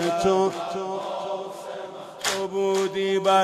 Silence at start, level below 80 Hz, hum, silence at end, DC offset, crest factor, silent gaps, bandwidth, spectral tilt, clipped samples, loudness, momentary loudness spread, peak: 0 s; -60 dBFS; none; 0 s; under 0.1%; 16 dB; none; 15 kHz; -4 dB/octave; under 0.1%; -25 LUFS; 14 LU; -8 dBFS